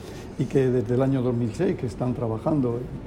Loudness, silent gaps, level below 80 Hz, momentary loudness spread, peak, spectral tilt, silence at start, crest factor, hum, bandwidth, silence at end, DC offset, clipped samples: -25 LUFS; none; -46 dBFS; 5 LU; -8 dBFS; -8.5 dB/octave; 0 s; 16 dB; none; 11 kHz; 0 s; under 0.1%; under 0.1%